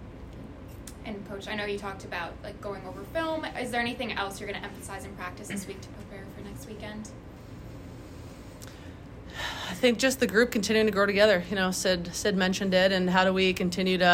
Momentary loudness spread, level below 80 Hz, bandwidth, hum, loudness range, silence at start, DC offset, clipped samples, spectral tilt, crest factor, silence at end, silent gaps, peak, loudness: 21 LU; -50 dBFS; 16 kHz; none; 17 LU; 0 s; under 0.1%; under 0.1%; -4 dB/octave; 22 dB; 0 s; none; -8 dBFS; -27 LUFS